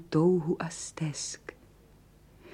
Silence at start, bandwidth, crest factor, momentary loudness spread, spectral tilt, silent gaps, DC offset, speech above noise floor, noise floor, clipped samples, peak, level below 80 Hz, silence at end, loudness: 0 s; 11.5 kHz; 18 dB; 16 LU; -5.5 dB/octave; none; under 0.1%; 28 dB; -58 dBFS; under 0.1%; -14 dBFS; -62 dBFS; 0 s; -30 LUFS